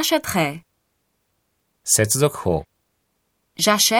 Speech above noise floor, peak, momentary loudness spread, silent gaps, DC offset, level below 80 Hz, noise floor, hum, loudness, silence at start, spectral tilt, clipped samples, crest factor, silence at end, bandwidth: 52 dB; -2 dBFS; 17 LU; none; under 0.1%; -50 dBFS; -71 dBFS; none; -19 LUFS; 0 s; -3 dB/octave; under 0.1%; 20 dB; 0 s; 19 kHz